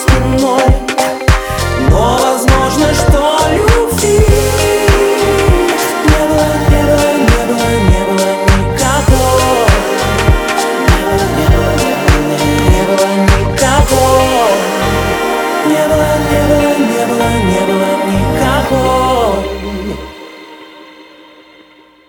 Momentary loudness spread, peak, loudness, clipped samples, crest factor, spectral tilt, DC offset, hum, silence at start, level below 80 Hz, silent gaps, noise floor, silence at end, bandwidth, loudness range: 3 LU; 0 dBFS; -11 LUFS; under 0.1%; 10 dB; -5 dB/octave; under 0.1%; none; 0 s; -18 dBFS; none; -42 dBFS; 1.05 s; over 20 kHz; 3 LU